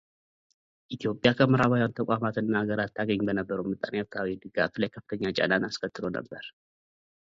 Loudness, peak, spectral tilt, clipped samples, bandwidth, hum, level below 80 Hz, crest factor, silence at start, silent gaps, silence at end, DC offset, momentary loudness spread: -28 LUFS; -6 dBFS; -7 dB/octave; under 0.1%; 7.6 kHz; none; -60 dBFS; 22 dB; 0.9 s; none; 0.9 s; under 0.1%; 11 LU